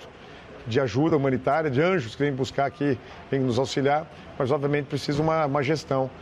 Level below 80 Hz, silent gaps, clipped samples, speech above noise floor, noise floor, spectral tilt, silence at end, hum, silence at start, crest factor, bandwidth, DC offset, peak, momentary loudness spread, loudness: -54 dBFS; none; under 0.1%; 20 dB; -44 dBFS; -6.5 dB/octave; 0 s; none; 0 s; 16 dB; 11.5 kHz; under 0.1%; -10 dBFS; 8 LU; -25 LUFS